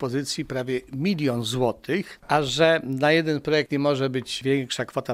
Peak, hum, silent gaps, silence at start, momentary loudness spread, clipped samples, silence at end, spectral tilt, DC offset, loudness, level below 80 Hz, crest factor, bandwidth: -4 dBFS; none; none; 0 s; 8 LU; under 0.1%; 0 s; -5 dB/octave; under 0.1%; -24 LUFS; -56 dBFS; 20 dB; 16 kHz